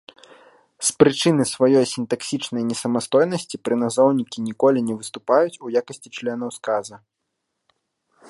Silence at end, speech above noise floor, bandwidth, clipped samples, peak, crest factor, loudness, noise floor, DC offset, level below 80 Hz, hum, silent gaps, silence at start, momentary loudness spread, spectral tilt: 1.3 s; 57 dB; 11.5 kHz; under 0.1%; 0 dBFS; 22 dB; -21 LUFS; -77 dBFS; under 0.1%; -66 dBFS; none; none; 0.8 s; 11 LU; -4.5 dB/octave